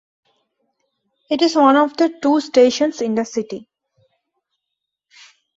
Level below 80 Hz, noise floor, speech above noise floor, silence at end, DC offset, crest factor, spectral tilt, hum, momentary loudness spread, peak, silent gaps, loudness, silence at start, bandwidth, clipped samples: -66 dBFS; -80 dBFS; 64 dB; 2 s; under 0.1%; 18 dB; -4 dB/octave; none; 12 LU; -2 dBFS; none; -16 LUFS; 1.3 s; 8 kHz; under 0.1%